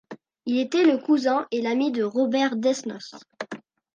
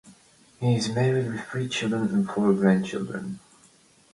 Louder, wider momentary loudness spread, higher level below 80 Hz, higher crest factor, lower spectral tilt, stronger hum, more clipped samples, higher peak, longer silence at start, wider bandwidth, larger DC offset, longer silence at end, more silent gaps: about the same, -23 LUFS vs -25 LUFS; first, 17 LU vs 11 LU; second, -78 dBFS vs -62 dBFS; about the same, 16 dB vs 18 dB; second, -4.5 dB/octave vs -6.5 dB/octave; neither; neither; about the same, -8 dBFS vs -8 dBFS; about the same, 0.1 s vs 0.05 s; second, 9.6 kHz vs 11.5 kHz; neither; second, 0.35 s vs 0.75 s; neither